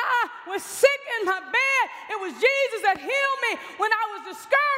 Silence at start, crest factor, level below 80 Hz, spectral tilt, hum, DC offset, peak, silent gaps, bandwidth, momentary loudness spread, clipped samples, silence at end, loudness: 0 s; 20 dB; -74 dBFS; -0.5 dB/octave; none; under 0.1%; -4 dBFS; none; 16 kHz; 10 LU; under 0.1%; 0 s; -23 LUFS